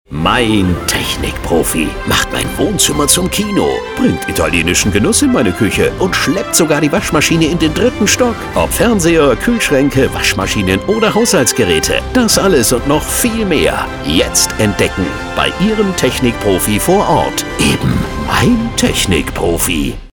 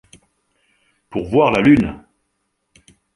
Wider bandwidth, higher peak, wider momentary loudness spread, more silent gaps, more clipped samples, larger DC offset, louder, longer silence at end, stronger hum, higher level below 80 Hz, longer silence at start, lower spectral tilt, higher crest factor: first, over 20 kHz vs 11 kHz; about the same, 0 dBFS vs -2 dBFS; second, 5 LU vs 16 LU; neither; neither; neither; first, -12 LUFS vs -16 LUFS; second, 0.05 s vs 1.2 s; neither; first, -28 dBFS vs -44 dBFS; second, 0.1 s vs 1.1 s; second, -4 dB/octave vs -7.5 dB/octave; second, 12 dB vs 18 dB